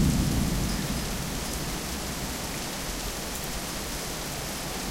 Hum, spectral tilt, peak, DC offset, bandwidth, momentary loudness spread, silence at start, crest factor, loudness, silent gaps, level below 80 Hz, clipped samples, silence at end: none; -4 dB/octave; -12 dBFS; under 0.1%; 17 kHz; 5 LU; 0 s; 18 dB; -30 LUFS; none; -36 dBFS; under 0.1%; 0 s